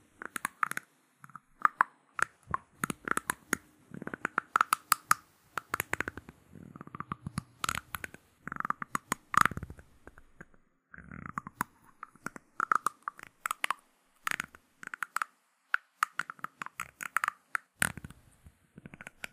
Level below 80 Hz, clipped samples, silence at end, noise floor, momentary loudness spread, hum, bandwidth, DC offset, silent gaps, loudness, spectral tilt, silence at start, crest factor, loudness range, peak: -62 dBFS; under 0.1%; 0.05 s; -66 dBFS; 21 LU; none; 15.5 kHz; under 0.1%; none; -34 LUFS; -2.5 dB/octave; 0.45 s; 32 dB; 5 LU; -4 dBFS